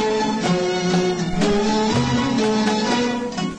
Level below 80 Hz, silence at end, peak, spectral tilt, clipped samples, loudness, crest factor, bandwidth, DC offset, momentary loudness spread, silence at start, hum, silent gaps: -42 dBFS; 0 s; -6 dBFS; -5 dB/octave; under 0.1%; -20 LUFS; 12 dB; 10 kHz; under 0.1%; 2 LU; 0 s; none; none